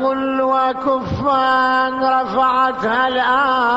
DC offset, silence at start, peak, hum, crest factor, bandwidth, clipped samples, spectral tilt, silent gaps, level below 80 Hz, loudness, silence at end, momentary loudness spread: under 0.1%; 0 s; -4 dBFS; none; 12 dB; 8 kHz; under 0.1%; -6 dB/octave; none; -46 dBFS; -16 LUFS; 0 s; 4 LU